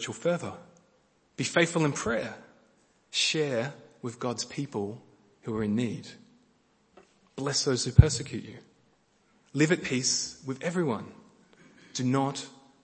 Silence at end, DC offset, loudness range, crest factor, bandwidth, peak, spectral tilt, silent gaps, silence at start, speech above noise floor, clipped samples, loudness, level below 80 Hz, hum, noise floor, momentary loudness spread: 0.3 s; under 0.1%; 7 LU; 30 dB; 8.8 kHz; 0 dBFS; -4.5 dB/octave; none; 0 s; 39 dB; under 0.1%; -29 LUFS; -44 dBFS; none; -67 dBFS; 18 LU